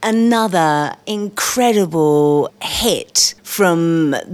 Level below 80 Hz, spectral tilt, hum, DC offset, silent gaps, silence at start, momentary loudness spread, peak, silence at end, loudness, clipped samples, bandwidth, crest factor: -46 dBFS; -4 dB/octave; none; under 0.1%; none; 0 s; 6 LU; 0 dBFS; 0 s; -15 LUFS; under 0.1%; over 20 kHz; 14 dB